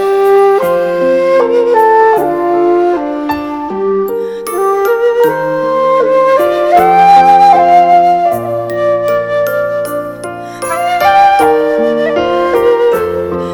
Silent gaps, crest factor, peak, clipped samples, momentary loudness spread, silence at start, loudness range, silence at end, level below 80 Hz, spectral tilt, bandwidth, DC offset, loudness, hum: none; 10 dB; 0 dBFS; 0.2%; 11 LU; 0 s; 5 LU; 0 s; -46 dBFS; -5.5 dB/octave; 19.5 kHz; under 0.1%; -10 LUFS; none